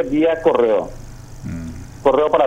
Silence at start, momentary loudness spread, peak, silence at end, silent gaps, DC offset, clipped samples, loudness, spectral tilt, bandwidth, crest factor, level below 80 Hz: 0 s; 19 LU; -2 dBFS; 0 s; none; under 0.1%; under 0.1%; -17 LUFS; -7 dB/octave; 10 kHz; 16 dB; -38 dBFS